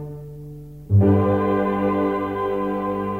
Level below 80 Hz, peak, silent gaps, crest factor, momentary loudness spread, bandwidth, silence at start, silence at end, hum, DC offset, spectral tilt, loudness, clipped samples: -48 dBFS; -6 dBFS; none; 14 dB; 20 LU; 4.2 kHz; 0 s; 0 s; 50 Hz at -40 dBFS; 0.2%; -10 dB/octave; -21 LUFS; under 0.1%